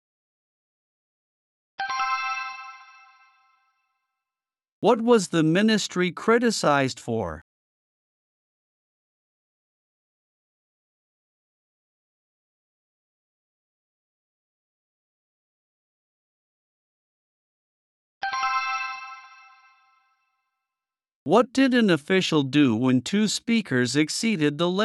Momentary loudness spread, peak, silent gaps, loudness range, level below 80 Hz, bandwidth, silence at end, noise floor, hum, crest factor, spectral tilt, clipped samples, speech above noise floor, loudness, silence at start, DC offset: 14 LU; -6 dBFS; 4.72-4.82 s, 7.42-18.21 s, 21.15-21.26 s; 11 LU; -68 dBFS; 12 kHz; 0 s; under -90 dBFS; none; 20 dB; -5 dB/octave; under 0.1%; over 69 dB; -23 LUFS; 1.8 s; under 0.1%